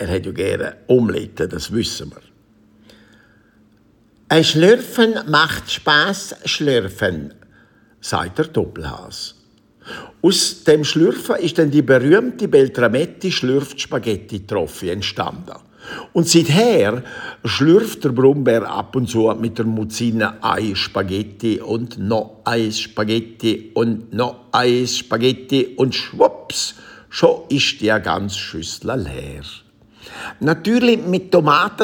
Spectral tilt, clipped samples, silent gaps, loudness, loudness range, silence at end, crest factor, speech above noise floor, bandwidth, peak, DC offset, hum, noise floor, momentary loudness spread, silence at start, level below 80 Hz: -4.5 dB/octave; under 0.1%; none; -17 LUFS; 7 LU; 0 s; 18 dB; 37 dB; 18 kHz; 0 dBFS; under 0.1%; none; -54 dBFS; 14 LU; 0 s; -50 dBFS